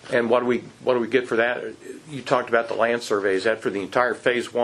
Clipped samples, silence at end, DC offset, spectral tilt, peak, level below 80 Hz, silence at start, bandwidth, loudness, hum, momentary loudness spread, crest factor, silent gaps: under 0.1%; 0 s; under 0.1%; -4.5 dB/octave; -2 dBFS; -68 dBFS; 0.05 s; 12.5 kHz; -23 LUFS; none; 9 LU; 20 dB; none